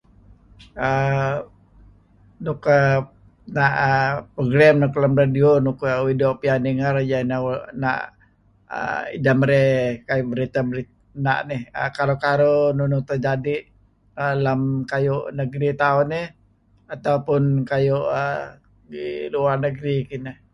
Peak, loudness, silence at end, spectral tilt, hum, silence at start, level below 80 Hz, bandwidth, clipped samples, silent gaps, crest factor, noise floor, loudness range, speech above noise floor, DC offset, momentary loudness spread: -2 dBFS; -21 LUFS; 0.2 s; -8 dB/octave; none; 0.6 s; -52 dBFS; 6.6 kHz; under 0.1%; none; 18 dB; -58 dBFS; 5 LU; 38 dB; under 0.1%; 13 LU